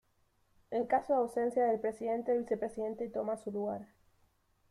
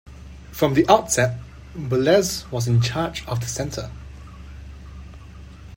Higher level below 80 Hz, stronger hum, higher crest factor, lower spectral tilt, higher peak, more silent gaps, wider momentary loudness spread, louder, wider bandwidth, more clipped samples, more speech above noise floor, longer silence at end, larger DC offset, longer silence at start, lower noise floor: second, -72 dBFS vs -42 dBFS; neither; about the same, 18 dB vs 22 dB; first, -7 dB/octave vs -5 dB/octave; second, -18 dBFS vs 0 dBFS; neither; second, 8 LU vs 25 LU; second, -34 LUFS vs -21 LUFS; second, 12 kHz vs 16.5 kHz; neither; first, 39 dB vs 20 dB; first, 0.85 s vs 0 s; neither; first, 0.7 s vs 0.05 s; first, -73 dBFS vs -40 dBFS